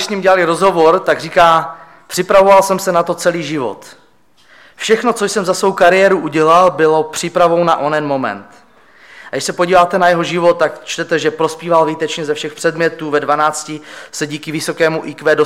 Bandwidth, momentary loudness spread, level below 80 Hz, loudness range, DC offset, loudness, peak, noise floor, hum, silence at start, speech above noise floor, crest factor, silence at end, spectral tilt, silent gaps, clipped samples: 16 kHz; 12 LU; -52 dBFS; 5 LU; 0.2%; -13 LUFS; 0 dBFS; -52 dBFS; none; 0 s; 39 dB; 14 dB; 0 s; -4 dB/octave; none; under 0.1%